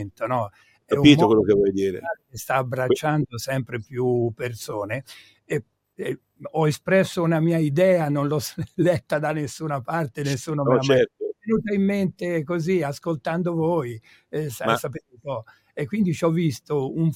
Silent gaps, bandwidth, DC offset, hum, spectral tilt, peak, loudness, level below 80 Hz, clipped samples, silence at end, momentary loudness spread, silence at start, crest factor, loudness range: none; 16.5 kHz; under 0.1%; none; -6.5 dB/octave; -2 dBFS; -23 LUFS; -56 dBFS; under 0.1%; 0 s; 14 LU; 0 s; 20 dB; 6 LU